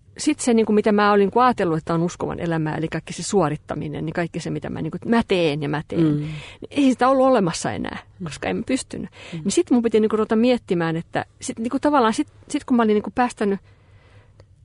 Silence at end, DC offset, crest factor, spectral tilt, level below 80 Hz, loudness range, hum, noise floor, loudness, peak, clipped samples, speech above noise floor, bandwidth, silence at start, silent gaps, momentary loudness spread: 1.05 s; under 0.1%; 16 dB; -5.5 dB/octave; -52 dBFS; 3 LU; none; -50 dBFS; -21 LUFS; -6 dBFS; under 0.1%; 29 dB; 11 kHz; 0.2 s; none; 12 LU